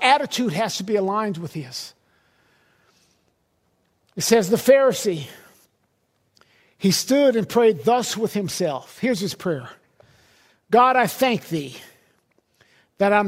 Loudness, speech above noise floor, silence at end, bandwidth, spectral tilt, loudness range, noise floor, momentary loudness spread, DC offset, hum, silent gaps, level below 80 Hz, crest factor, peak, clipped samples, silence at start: -21 LUFS; 48 dB; 0 s; 16 kHz; -4 dB/octave; 6 LU; -68 dBFS; 15 LU; under 0.1%; none; none; -66 dBFS; 20 dB; -2 dBFS; under 0.1%; 0 s